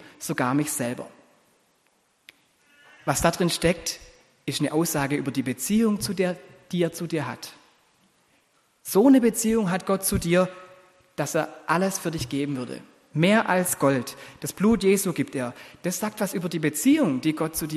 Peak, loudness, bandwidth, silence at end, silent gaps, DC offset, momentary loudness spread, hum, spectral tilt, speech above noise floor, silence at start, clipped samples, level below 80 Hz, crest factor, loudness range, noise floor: -4 dBFS; -24 LUFS; 13 kHz; 0 s; none; under 0.1%; 14 LU; none; -5 dB/octave; 43 dB; 0.05 s; under 0.1%; -52 dBFS; 20 dB; 5 LU; -66 dBFS